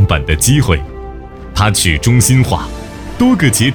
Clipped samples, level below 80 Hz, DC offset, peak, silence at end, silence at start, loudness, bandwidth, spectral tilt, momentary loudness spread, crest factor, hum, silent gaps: under 0.1%; -24 dBFS; under 0.1%; 0 dBFS; 0 s; 0 s; -12 LUFS; over 20 kHz; -4.5 dB/octave; 18 LU; 12 dB; none; none